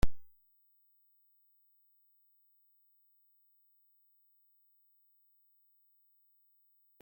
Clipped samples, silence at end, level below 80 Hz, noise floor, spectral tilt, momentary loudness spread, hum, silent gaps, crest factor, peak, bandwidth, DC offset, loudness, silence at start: under 0.1%; 6.8 s; -50 dBFS; -71 dBFS; -6 dB/octave; 0 LU; 50 Hz at -120 dBFS; none; 24 dB; -14 dBFS; 16.5 kHz; under 0.1%; -59 LUFS; 0.05 s